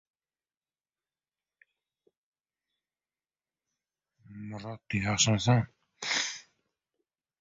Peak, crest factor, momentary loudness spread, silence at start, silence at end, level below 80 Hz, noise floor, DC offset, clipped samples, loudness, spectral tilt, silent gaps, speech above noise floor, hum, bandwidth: -10 dBFS; 24 dB; 18 LU; 4.3 s; 1 s; -60 dBFS; under -90 dBFS; under 0.1%; under 0.1%; -28 LUFS; -3.5 dB/octave; none; over 62 dB; none; 7.8 kHz